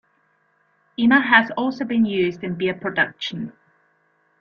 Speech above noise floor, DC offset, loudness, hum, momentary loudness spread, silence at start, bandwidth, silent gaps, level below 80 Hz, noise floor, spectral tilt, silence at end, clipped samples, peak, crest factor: 44 dB; under 0.1%; -20 LUFS; none; 15 LU; 1 s; 7 kHz; none; -62 dBFS; -64 dBFS; -6.5 dB/octave; 0.9 s; under 0.1%; -2 dBFS; 20 dB